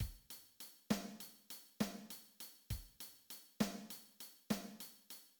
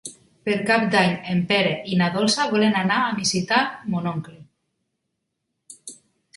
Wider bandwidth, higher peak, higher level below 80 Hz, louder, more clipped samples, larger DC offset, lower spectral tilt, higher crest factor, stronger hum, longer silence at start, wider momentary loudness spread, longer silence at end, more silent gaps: first, 19.5 kHz vs 11.5 kHz; second, -24 dBFS vs -4 dBFS; about the same, -60 dBFS vs -62 dBFS; second, -47 LUFS vs -21 LUFS; neither; neither; about the same, -4.5 dB/octave vs -4.5 dB/octave; first, 24 dB vs 18 dB; neither; about the same, 0 s vs 0.05 s; second, 13 LU vs 17 LU; second, 0.1 s vs 0.45 s; neither